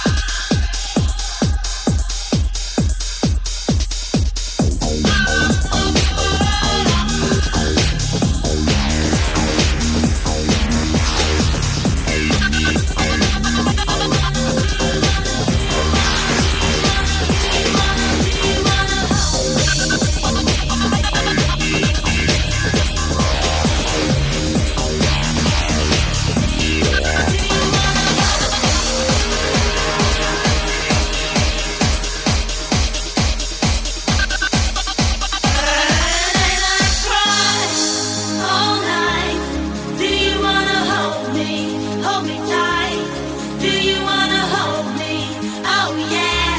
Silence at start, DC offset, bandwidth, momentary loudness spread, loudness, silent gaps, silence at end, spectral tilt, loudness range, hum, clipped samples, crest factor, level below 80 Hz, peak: 0 s; under 0.1%; 8 kHz; 5 LU; -17 LUFS; none; 0 s; -3.5 dB/octave; 3 LU; none; under 0.1%; 14 dB; -22 dBFS; -2 dBFS